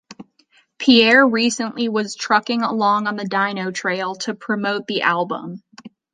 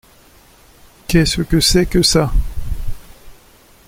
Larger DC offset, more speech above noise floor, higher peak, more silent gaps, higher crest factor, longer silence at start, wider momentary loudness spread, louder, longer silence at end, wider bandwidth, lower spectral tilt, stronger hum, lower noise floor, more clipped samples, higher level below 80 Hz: neither; first, 40 dB vs 34 dB; about the same, -2 dBFS vs 0 dBFS; neither; about the same, 18 dB vs 16 dB; second, 0.1 s vs 1.1 s; second, 12 LU vs 17 LU; second, -18 LUFS vs -15 LUFS; second, 0.25 s vs 0.55 s; second, 9.6 kHz vs 16.5 kHz; about the same, -3.5 dB/octave vs -4.5 dB/octave; neither; first, -58 dBFS vs -47 dBFS; neither; second, -66 dBFS vs -24 dBFS